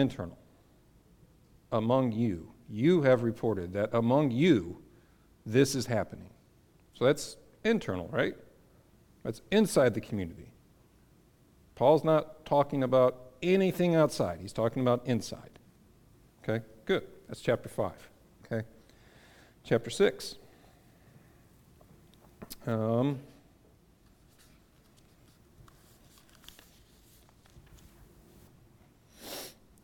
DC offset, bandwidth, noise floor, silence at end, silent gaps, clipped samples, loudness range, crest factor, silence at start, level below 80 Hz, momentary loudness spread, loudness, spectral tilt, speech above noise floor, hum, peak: under 0.1%; 18 kHz; -62 dBFS; 0.3 s; none; under 0.1%; 9 LU; 20 dB; 0 s; -60 dBFS; 17 LU; -30 LUFS; -6 dB/octave; 34 dB; none; -12 dBFS